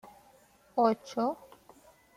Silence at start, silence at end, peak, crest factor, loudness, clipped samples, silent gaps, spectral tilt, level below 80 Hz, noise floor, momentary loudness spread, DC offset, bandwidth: 0.05 s; 0.85 s; -12 dBFS; 20 dB; -31 LUFS; under 0.1%; none; -6 dB/octave; -74 dBFS; -62 dBFS; 10 LU; under 0.1%; 15.5 kHz